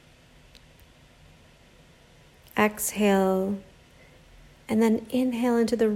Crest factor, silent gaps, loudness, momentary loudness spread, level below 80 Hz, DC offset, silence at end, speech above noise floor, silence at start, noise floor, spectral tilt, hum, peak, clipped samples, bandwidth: 20 dB; none; -25 LUFS; 8 LU; -58 dBFS; under 0.1%; 0 s; 31 dB; 2.55 s; -55 dBFS; -5 dB/octave; none; -8 dBFS; under 0.1%; 16 kHz